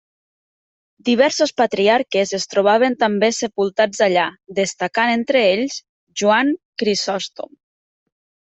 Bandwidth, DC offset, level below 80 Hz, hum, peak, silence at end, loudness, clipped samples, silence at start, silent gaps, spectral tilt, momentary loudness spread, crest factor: 8.4 kHz; under 0.1%; -66 dBFS; none; -2 dBFS; 1.05 s; -18 LUFS; under 0.1%; 1.05 s; 5.89-6.07 s, 6.65-6.73 s; -3.5 dB/octave; 10 LU; 16 dB